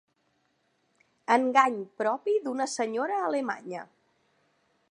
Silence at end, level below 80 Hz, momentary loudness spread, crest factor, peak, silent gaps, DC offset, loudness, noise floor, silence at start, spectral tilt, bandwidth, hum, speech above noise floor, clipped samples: 1.05 s; -86 dBFS; 14 LU; 24 dB; -6 dBFS; none; under 0.1%; -27 LUFS; -73 dBFS; 1.3 s; -3.5 dB/octave; 11.5 kHz; none; 45 dB; under 0.1%